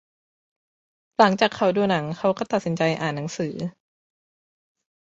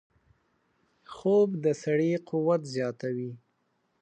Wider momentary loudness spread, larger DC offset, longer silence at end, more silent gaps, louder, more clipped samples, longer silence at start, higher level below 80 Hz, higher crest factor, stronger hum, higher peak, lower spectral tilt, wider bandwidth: about the same, 11 LU vs 11 LU; neither; first, 1.3 s vs 0.65 s; neither; first, -23 LUFS vs -28 LUFS; neither; about the same, 1.2 s vs 1.1 s; first, -64 dBFS vs -76 dBFS; first, 24 dB vs 16 dB; neither; first, -2 dBFS vs -14 dBFS; second, -5.5 dB/octave vs -7 dB/octave; second, 8 kHz vs 9.2 kHz